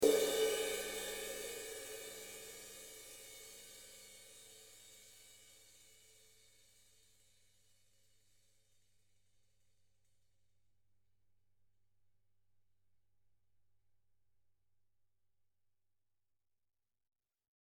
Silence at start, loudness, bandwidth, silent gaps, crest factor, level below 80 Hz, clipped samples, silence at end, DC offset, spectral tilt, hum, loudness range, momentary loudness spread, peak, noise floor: 0 s; -41 LUFS; 18 kHz; none; 28 dB; -76 dBFS; under 0.1%; 12.2 s; under 0.1%; -1.5 dB/octave; none; 24 LU; 25 LU; -18 dBFS; under -90 dBFS